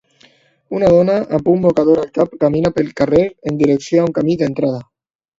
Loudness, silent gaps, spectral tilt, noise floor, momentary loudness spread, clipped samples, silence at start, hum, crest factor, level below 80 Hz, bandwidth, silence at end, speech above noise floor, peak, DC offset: -15 LUFS; none; -8 dB/octave; -52 dBFS; 7 LU; under 0.1%; 0.7 s; none; 16 dB; -46 dBFS; 7.8 kHz; 0.55 s; 37 dB; 0 dBFS; under 0.1%